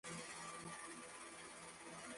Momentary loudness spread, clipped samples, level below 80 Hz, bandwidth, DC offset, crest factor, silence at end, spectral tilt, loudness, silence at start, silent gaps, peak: 4 LU; under 0.1%; -80 dBFS; 11.5 kHz; under 0.1%; 14 dB; 0 s; -2.5 dB/octave; -52 LUFS; 0.05 s; none; -38 dBFS